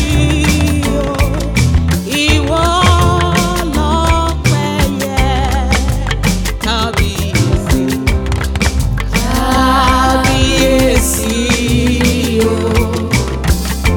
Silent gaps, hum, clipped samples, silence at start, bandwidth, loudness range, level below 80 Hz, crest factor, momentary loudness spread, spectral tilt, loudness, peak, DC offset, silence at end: none; none; under 0.1%; 0 s; over 20 kHz; 3 LU; -18 dBFS; 12 dB; 5 LU; -5 dB/octave; -13 LUFS; 0 dBFS; under 0.1%; 0 s